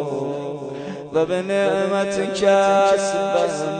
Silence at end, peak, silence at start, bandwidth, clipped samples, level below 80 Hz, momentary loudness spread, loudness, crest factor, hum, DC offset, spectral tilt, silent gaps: 0 s; -6 dBFS; 0 s; 9.4 kHz; under 0.1%; -58 dBFS; 13 LU; -20 LUFS; 14 dB; none; under 0.1%; -4.5 dB/octave; none